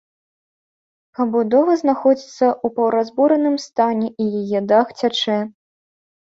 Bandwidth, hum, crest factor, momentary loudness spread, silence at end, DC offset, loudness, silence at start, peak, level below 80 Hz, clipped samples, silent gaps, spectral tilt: 7.8 kHz; none; 16 dB; 6 LU; 0.9 s; under 0.1%; -18 LUFS; 1.2 s; -2 dBFS; -66 dBFS; under 0.1%; none; -5.5 dB/octave